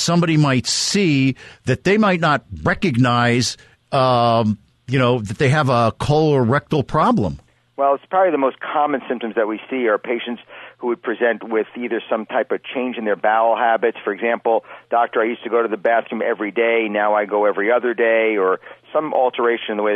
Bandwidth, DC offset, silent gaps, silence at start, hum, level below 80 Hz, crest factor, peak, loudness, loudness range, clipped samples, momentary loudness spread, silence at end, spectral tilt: 12 kHz; under 0.1%; none; 0 s; none; -48 dBFS; 14 dB; -6 dBFS; -18 LUFS; 4 LU; under 0.1%; 8 LU; 0 s; -5.5 dB/octave